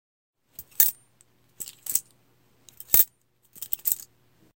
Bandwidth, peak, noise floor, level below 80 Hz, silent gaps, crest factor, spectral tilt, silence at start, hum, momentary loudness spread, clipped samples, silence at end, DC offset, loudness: 17.5 kHz; 0 dBFS; -64 dBFS; -62 dBFS; none; 30 dB; 0.5 dB/octave; 0.6 s; none; 21 LU; under 0.1%; 0.6 s; under 0.1%; -23 LUFS